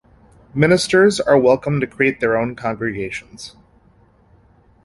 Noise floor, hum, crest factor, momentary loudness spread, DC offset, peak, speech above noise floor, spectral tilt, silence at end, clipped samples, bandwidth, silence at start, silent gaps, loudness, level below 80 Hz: -53 dBFS; none; 18 dB; 16 LU; under 0.1%; -2 dBFS; 36 dB; -5.5 dB/octave; 1.35 s; under 0.1%; 11.5 kHz; 0.55 s; none; -17 LUFS; -50 dBFS